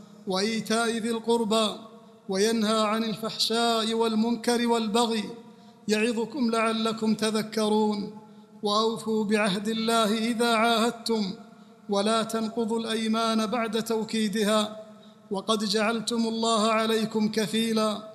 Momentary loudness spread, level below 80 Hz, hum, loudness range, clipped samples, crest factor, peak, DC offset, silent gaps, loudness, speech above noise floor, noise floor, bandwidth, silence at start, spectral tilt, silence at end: 7 LU; -70 dBFS; none; 2 LU; under 0.1%; 16 dB; -10 dBFS; under 0.1%; none; -26 LUFS; 22 dB; -47 dBFS; 14 kHz; 0 s; -4 dB/octave; 0 s